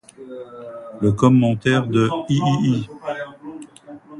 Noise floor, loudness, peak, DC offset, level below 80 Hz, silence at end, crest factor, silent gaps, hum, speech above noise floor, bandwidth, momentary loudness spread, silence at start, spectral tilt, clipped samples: -41 dBFS; -19 LUFS; -2 dBFS; under 0.1%; -52 dBFS; 0 s; 18 dB; none; none; 22 dB; 10.5 kHz; 22 LU; 0.2 s; -7 dB/octave; under 0.1%